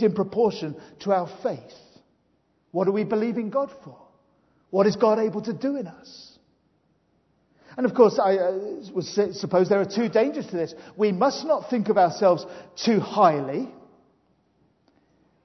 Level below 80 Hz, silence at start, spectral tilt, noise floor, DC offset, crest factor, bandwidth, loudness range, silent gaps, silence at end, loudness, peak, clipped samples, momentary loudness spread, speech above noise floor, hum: -70 dBFS; 0 s; -6.5 dB/octave; -67 dBFS; under 0.1%; 22 dB; 6.2 kHz; 5 LU; none; 1.75 s; -24 LUFS; -4 dBFS; under 0.1%; 14 LU; 44 dB; none